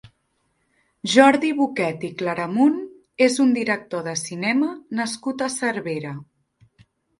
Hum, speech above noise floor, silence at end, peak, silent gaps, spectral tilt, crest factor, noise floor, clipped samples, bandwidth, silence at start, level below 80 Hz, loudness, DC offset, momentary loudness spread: none; 49 dB; 0.95 s; 0 dBFS; none; -4 dB/octave; 22 dB; -70 dBFS; under 0.1%; 11.5 kHz; 0.05 s; -66 dBFS; -21 LUFS; under 0.1%; 14 LU